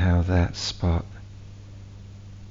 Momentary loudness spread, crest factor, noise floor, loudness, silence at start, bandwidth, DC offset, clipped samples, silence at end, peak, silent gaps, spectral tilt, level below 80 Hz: 22 LU; 18 dB; -42 dBFS; -25 LUFS; 0 s; 7.6 kHz; under 0.1%; under 0.1%; 0 s; -8 dBFS; none; -6 dB/octave; -36 dBFS